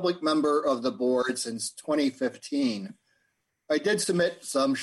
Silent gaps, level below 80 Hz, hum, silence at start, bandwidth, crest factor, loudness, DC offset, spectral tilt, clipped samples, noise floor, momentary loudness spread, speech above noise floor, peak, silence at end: none; -74 dBFS; none; 0 s; 12.5 kHz; 14 dB; -27 LUFS; under 0.1%; -4 dB/octave; under 0.1%; -76 dBFS; 7 LU; 49 dB; -12 dBFS; 0 s